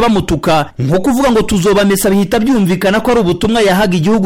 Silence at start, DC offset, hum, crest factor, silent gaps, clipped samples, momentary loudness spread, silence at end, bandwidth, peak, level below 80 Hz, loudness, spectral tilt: 0 s; under 0.1%; none; 6 dB; none; under 0.1%; 3 LU; 0 s; 17 kHz; -4 dBFS; -32 dBFS; -12 LUFS; -5.5 dB/octave